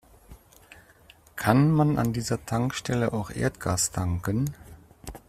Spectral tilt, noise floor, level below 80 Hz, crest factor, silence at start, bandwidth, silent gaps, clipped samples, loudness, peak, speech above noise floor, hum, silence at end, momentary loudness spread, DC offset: -5.5 dB/octave; -55 dBFS; -50 dBFS; 24 dB; 0.3 s; 15.5 kHz; none; under 0.1%; -26 LUFS; -4 dBFS; 30 dB; none; 0.1 s; 14 LU; under 0.1%